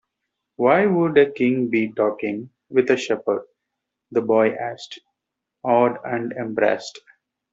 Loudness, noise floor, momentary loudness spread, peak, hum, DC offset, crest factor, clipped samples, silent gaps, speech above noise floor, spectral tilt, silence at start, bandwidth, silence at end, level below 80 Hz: -21 LUFS; -83 dBFS; 13 LU; -2 dBFS; none; under 0.1%; 18 dB; under 0.1%; none; 63 dB; -6.5 dB/octave; 0.6 s; 7.8 kHz; 0.55 s; -68 dBFS